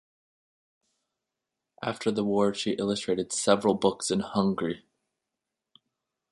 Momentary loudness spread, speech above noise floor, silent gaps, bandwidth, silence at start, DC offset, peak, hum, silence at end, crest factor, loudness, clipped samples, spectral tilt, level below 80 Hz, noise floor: 10 LU; 60 dB; none; 11.5 kHz; 1.8 s; under 0.1%; -6 dBFS; none; 1.55 s; 24 dB; -27 LUFS; under 0.1%; -4.5 dB/octave; -66 dBFS; -86 dBFS